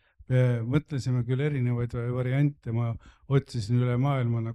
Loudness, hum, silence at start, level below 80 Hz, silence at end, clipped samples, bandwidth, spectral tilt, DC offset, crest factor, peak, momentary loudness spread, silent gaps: -27 LUFS; none; 0.3 s; -54 dBFS; 0 s; under 0.1%; 9.4 kHz; -8.5 dB/octave; under 0.1%; 16 dB; -12 dBFS; 5 LU; none